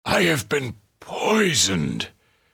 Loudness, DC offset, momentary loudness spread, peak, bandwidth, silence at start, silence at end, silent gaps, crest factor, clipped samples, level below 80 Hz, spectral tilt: -21 LUFS; under 0.1%; 15 LU; -6 dBFS; over 20 kHz; 0.05 s; 0.45 s; none; 18 dB; under 0.1%; -52 dBFS; -3.5 dB/octave